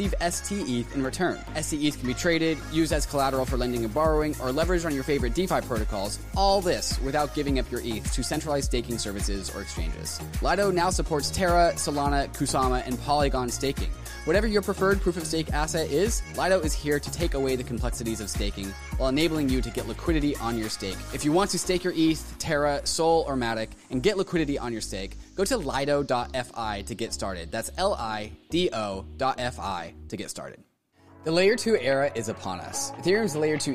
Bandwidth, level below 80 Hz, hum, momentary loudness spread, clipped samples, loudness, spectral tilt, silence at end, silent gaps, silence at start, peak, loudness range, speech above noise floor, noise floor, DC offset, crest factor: 15.5 kHz; -36 dBFS; none; 9 LU; under 0.1%; -27 LUFS; -4.5 dB/octave; 0 s; none; 0 s; -10 dBFS; 4 LU; 31 dB; -57 dBFS; 0.3%; 16 dB